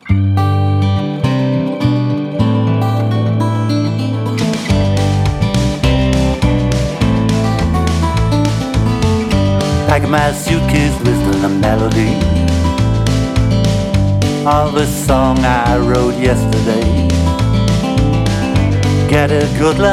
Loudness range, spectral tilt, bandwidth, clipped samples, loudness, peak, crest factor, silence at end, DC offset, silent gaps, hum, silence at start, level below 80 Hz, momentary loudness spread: 2 LU; -6.5 dB/octave; 15 kHz; under 0.1%; -14 LUFS; 0 dBFS; 12 dB; 0 s; under 0.1%; none; none; 0.05 s; -22 dBFS; 3 LU